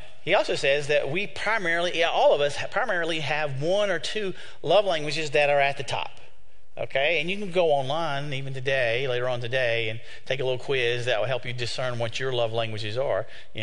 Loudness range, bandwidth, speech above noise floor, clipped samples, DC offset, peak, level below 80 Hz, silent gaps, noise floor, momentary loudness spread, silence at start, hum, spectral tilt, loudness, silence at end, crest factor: 3 LU; 10.5 kHz; 33 dB; under 0.1%; 3%; -8 dBFS; -58 dBFS; none; -58 dBFS; 9 LU; 0 s; none; -4.5 dB/octave; -25 LUFS; 0 s; 18 dB